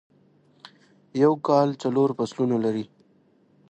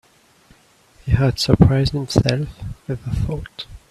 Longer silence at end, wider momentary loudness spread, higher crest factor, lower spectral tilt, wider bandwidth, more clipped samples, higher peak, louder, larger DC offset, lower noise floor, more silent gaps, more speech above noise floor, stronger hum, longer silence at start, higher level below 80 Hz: first, 0.85 s vs 0.15 s; second, 11 LU vs 19 LU; about the same, 20 dB vs 20 dB; about the same, -7.5 dB/octave vs -6.5 dB/octave; second, 9 kHz vs 13.5 kHz; neither; second, -6 dBFS vs 0 dBFS; second, -23 LUFS vs -19 LUFS; neither; first, -61 dBFS vs -53 dBFS; neither; first, 39 dB vs 35 dB; neither; about the same, 1.15 s vs 1.05 s; second, -72 dBFS vs -34 dBFS